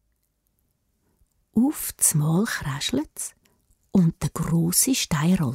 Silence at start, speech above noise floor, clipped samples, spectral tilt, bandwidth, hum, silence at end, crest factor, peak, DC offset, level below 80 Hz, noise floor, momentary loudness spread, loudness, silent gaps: 1.55 s; 49 dB; under 0.1%; -4.5 dB/octave; 16 kHz; none; 0 s; 20 dB; -4 dBFS; under 0.1%; -50 dBFS; -71 dBFS; 9 LU; -23 LUFS; none